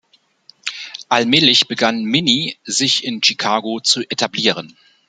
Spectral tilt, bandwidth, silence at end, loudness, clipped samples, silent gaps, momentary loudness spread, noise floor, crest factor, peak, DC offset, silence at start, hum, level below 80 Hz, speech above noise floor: -2.5 dB/octave; 9.6 kHz; 0.4 s; -15 LUFS; under 0.1%; none; 15 LU; -51 dBFS; 18 dB; 0 dBFS; under 0.1%; 0.65 s; none; -64 dBFS; 34 dB